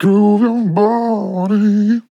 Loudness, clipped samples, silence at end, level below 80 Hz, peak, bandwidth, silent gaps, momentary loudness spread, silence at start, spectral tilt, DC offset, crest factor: -14 LUFS; under 0.1%; 0.1 s; -78 dBFS; -2 dBFS; 7 kHz; none; 5 LU; 0 s; -9 dB/octave; under 0.1%; 12 dB